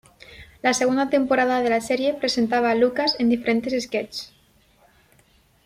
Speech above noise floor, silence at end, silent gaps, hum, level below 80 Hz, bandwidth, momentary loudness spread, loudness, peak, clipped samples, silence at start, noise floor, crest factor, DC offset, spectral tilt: 38 dB; 1.4 s; none; none; -58 dBFS; 15 kHz; 8 LU; -21 LUFS; -6 dBFS; under 0.1%; 0.3 s; -59 dBFS; 18 dB; under 0.1%; -3.5 dB/octave